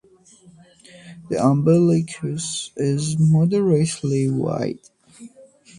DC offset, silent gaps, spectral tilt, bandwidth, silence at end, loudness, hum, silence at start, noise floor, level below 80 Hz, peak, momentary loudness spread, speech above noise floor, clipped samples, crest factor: under 0.1%; none; -6.5 dB/octave; 11 kHz; 0.5 s; -20 LUFS; none; 1.05 s; -51 dBFS; -56 dBFS; -4 dBFS; 11 LU; 32 dB; under 0.1%; 18 dB